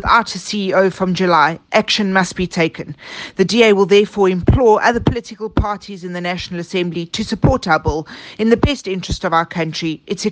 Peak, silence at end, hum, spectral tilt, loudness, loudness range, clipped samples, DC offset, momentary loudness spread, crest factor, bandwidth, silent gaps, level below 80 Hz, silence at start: 0 dBFS; 0 s; none; -5.5 dB/octave; -16 LUFS; 4 LU; under 0.1%; under 0.1%; 12 LU; 16 dB; 9.6 kHz; none; -32 dBFS; 0 s